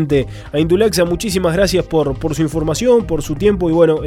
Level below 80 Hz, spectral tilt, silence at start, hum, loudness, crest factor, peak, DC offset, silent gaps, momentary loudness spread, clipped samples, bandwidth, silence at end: -32 dBFS; -5.5 dB/octave; 0 s; none; -15 LUFS; 14 dB; -2 dBFS; under 0.1%; none; 6 LU; under 0.1%; 16.5 kHz; 0 s